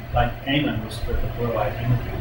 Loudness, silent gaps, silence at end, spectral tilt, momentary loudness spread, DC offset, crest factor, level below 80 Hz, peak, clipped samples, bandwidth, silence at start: -25 LUFS; none; 0 s; -7 dB/octave; 6 LU; under 0.1%; 16 dB; -30 dBFS; -6 dBFS; under 0.1%; 16.5 kHz; 0 s